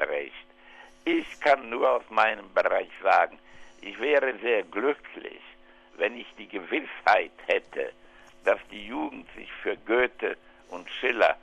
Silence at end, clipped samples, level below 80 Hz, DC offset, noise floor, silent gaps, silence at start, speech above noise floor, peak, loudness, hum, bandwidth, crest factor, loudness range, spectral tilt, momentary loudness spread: 0.05 s; under 0.1%; -62 dBFS; under 0.1%; -51 dBFS; none; 0 s; 24 dB; -6 dBFS; -27 LUFS; none; 10 kHz; 22 dB; 4 LU; -4 dB/octave; 18 LU